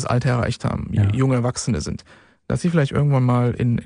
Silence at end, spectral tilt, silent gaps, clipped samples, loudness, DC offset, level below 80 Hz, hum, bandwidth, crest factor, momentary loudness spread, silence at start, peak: 0 s; -7 dB/octave; none; under 0.1%; -20 LUFS; under 0.1%; -42 dBFS; none; 10.5 kHz; 14 dB; 8 LU; 0 s; -6 dBFS